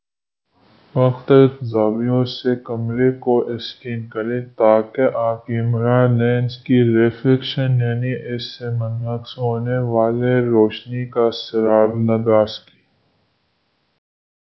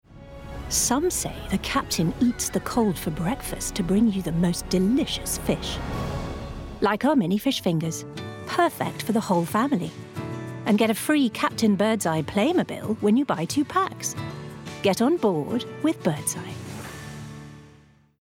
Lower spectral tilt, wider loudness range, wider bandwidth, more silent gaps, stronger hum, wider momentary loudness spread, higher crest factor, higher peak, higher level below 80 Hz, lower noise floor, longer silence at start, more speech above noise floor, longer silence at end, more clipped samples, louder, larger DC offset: first, -9.5 dB/octave vs -4.5 dB/octave; about the same, 3 LU vs 3 LU; second, 6 kHz vs 18 kHz; neither; neither; second, 10 LU vs 14 LU; about the same, 18 dB vs 16 dB; first, 0 dBFS vs -10 dBFS; second, -56 dBFS vs -44 dBFS; first, -81 dBFS vs -54 dBFS; first, 0.95 s vs 0.1 s; first, 64 dB vs 31 dB; first, 2 s vs 0.5 s; neither; first, -18 LUFS vs -24 LUFS; neither